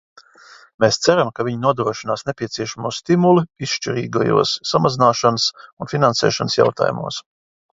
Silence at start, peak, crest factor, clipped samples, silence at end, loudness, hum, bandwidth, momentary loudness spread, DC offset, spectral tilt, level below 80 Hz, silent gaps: 0.8 s; 0 dBFS; 18 dB; under 0.1%; 0.5 s; -18 LUFS; none; 7.8 kHz; 10 LU; under 0.1%; -5 dB/octave; -56 dBFS; 5.73-5.77 s